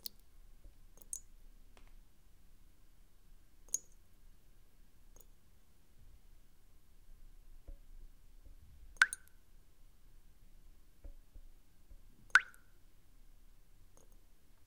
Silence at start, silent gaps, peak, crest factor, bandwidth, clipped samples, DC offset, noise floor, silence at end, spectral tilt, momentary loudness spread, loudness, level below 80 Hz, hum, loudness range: 0.05 s; none; -6 dBFS; 40 dB; 16 kHz; under 0.1%; under 0.1%; -67 dBFS; 0.1 s; 1 dB/octave; 32 LU; -35 LUFS; -60 dBFS; none; 10 LU